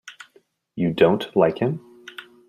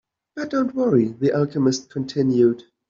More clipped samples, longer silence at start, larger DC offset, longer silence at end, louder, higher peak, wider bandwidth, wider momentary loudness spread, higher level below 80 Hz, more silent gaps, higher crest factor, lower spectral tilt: neither; second, 0.05 s vs 0.35 s; neither; about the same, 0.25 s vs 0.3 s; about the same, -21 LUFS vs -21 LUFS; first, -2 dBFS vs -6 dBFS; first, 14 kHz vs 7.6 kHz; first, 22 LU vs 9 LU; about the same, -60 dBFS vs -62 dBFS; neither; first, 22 dB vs 14 dB; about the same, -7.5 dB/octave vs -7 dB/octave